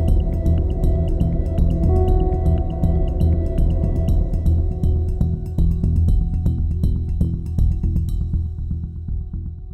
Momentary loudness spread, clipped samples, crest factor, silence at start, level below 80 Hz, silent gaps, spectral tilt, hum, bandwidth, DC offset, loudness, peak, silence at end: 7 LU; under 0.1%; 12 dB; 0 s; -20 dBFS; none; -10.5 dB/octave; none; 4.1 kHz; under 0.1%; -21 LUFS; -6 dBFS; 0 s